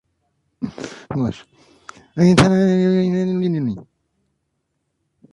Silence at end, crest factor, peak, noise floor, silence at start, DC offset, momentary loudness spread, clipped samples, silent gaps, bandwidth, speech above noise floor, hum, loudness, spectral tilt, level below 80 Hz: 1.5 s; 20 dB; 0 dBFS; -73 dBFS; 0.6 s; under 0.1%; 19 LU; under 0.1%; none; 11.5 kHz; 56 dB; none; -18 LUFS; -7 dB/octave; -46 dBFS